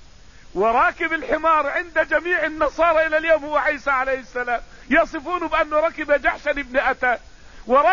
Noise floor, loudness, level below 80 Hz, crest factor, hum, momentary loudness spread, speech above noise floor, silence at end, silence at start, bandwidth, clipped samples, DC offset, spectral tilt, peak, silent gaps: -46 dBFS; -20 LUFS; -44 dBFS; 16 dB; none; 7 LU; 26 dB; 0 s; 0.55 s; 7.4 kHz; under 0.1%; 0.4%; -4.5 dB/octave; -6 dBFS; none